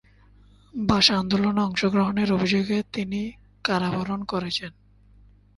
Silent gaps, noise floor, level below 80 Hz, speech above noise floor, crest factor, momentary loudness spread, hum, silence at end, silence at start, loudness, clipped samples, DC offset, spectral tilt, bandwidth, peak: none; -54 dBFS; -50 dBFS; 31 dB; 22 dB; 12 LU; 50 Hz at -40 dBFS; 0.9 s; 0.75 s; -23 LUFS; under 0.1%; under 0.1%; -5 dB/octave; 11.5 kHz; -4 dBFS